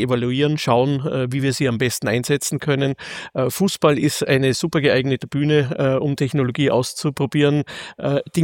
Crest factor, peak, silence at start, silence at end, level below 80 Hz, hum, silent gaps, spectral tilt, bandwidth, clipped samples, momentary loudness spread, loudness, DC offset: 18 dB; -2 dBFS; 0 s; 0 s; -56 dBFS; none; none; -5.5 dB/octave; 17 kHz; under 0.1%; 6 LU; -20 LUFS; under 0.1%